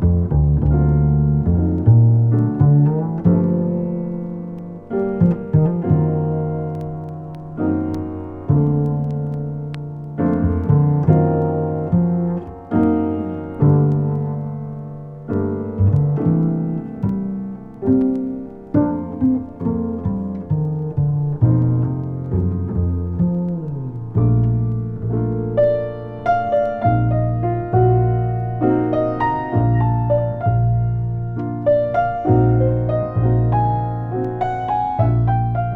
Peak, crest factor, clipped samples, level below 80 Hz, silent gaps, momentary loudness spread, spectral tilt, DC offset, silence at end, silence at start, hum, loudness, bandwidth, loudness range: -2 dBFS; 16 dB; under 0.1%; -32 dBFS; none; 10 LU; -12 dB/octave; under 0.1%; 0 s; 0 s; none; -19 LUFS; 3.7 kHz; 4 LU